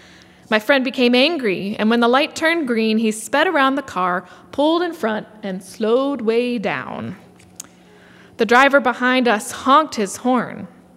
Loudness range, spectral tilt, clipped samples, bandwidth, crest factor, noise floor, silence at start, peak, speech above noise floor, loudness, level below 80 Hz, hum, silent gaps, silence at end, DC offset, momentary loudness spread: 5 LU; -4 dB/octave; under 0.1%; 16 kHz; 18 dB; -47 dBFS; 0.5 s; 0 dBFS; 29 dB; -17 LUFS; -66 dBFS; none; none; 0.3 s; under 0.1%; 15 LU